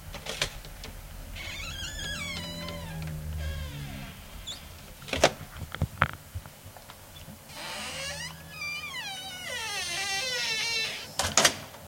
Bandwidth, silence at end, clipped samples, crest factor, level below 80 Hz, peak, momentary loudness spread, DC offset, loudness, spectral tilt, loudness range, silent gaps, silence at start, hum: 16.5 kHz; 0 s; under 0.1%; 32 dB; -48 dBFS; 0 dBFS; 18 LU; under 0.1%; -31 LUFS; -2 dB/octave; 7 LU; none; 0 s; none